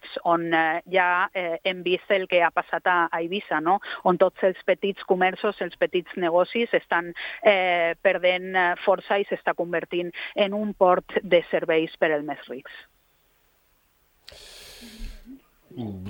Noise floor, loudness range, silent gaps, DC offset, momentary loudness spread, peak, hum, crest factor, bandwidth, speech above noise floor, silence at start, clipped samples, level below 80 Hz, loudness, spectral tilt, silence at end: -64 dBFS; 5 LU; none; under 0.1%; 15 LU; -4 dBFS; none; 22 dB; 16.5 kHz; 41 dB; 0.05 s; under 0.1%; -54 dBFS; -23 LUFS; -6 dB/octave; 0 s